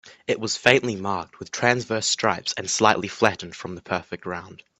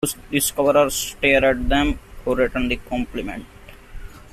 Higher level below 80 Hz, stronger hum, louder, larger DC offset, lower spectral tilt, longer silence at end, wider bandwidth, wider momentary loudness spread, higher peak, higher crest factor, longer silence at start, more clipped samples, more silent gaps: second, -62 dBFS vs -34 dBFS; neither; second, -23 LUFS vs -20 LUFS; neither; about the same, -3 dB/octave vs -3.5 dB/octave; first, 0.25 s vs 0.05 s; second, 12 kHz vs 16 kHz; first, 15 LU vs 12 LU; first, 0 dBFS vs -4 dBFS; first, 24 dB vs 18 dB; about the same, 0.05 s vs 0 s; neither; neither